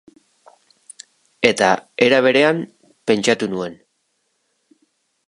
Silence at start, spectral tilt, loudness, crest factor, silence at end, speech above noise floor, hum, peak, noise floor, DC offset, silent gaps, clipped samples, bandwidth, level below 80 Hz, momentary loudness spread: 1.4 s; -4 dB/octave; -17 LUFS; 20 dB; 1.55 s; 53 dB; none; 0 dBFS; -69 dBFS; under 0.1%; none; under 0.1%; 11.5 kHz; -64 dBFS; 14 LU